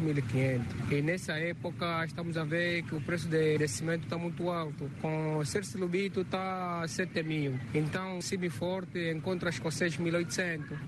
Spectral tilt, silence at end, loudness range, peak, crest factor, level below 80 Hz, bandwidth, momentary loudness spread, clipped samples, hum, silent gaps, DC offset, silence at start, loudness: -5.5 dB/octave; 0 s; 2 LU; -16 dBFS; 16 dB; -62 dBFS; 12.5 kHz; 5 LU; under 0.1%; none; none; under 0.1%; 0 s; -33 LUFS